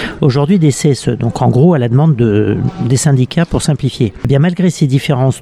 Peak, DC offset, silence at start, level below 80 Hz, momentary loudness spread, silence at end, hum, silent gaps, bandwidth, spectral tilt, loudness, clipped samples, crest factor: 0 dBFS; under 0.1%; 0 s; -36 dBFS; 5 LU; 0 s; none; none; 13 kHz; -6.5 dB/octave; -12 LUFS; under 0.1%; 10 dB